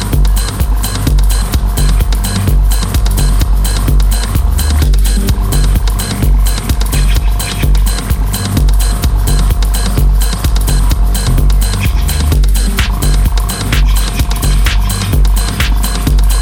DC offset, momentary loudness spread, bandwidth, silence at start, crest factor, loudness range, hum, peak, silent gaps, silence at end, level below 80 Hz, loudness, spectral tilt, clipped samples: under 0.1%; 2 LU; 18.5 kHz; 0 s; 8 dB; 1 LU; none; 0 dBFS; none; 0 s; -10 dBFS; -13 LUFS; -4.5 dB/octave; under 0.1%